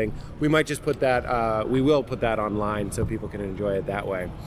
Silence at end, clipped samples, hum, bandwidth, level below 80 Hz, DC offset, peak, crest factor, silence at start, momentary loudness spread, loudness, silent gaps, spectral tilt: 0 s; under 0.1%; none; 15.5 kHz; -40 dBFS; under 0.1%; -6 dBFS; 18 dB; 0 s; 7 LU; -25 LUFS; none; -6 dB/octave